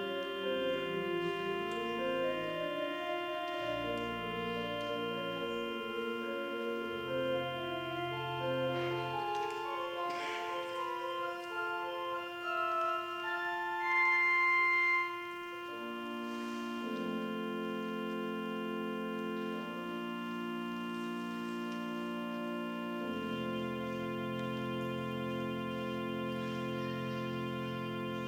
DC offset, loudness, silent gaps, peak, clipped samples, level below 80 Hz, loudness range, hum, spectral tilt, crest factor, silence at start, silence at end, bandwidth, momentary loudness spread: under 0.1%; -36 LUFS; none; -22 dBFS; under 0.1%; -70 dBFS; 8 LU; none; -5.5 dB/octave; 16 dB; 0 s; 0 s; 16 kHz; 6 LU